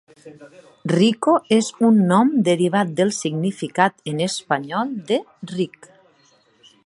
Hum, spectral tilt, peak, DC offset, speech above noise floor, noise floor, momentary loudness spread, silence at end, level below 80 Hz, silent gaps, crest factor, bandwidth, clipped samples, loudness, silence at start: none; -5.5 dB/octave; 0 dBFS; under 0.1%; 38 dB; -58 dBFS; 10 LU; 1.2 s; -68 dBFS; none; 20 dB; 11.5 kHz; under 0.1%; -19 LUFS; 0.25 s